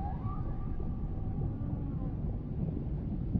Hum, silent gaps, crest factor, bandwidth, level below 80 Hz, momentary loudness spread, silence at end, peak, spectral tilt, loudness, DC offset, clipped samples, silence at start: none; none; 18 dB; 3.8 kHz; -38 dBFS; 2 LU; 0 s; -18 dBFS; -11.5 dB/octave; -37 LUFS; under 0.1%; under 0.1%; 0 s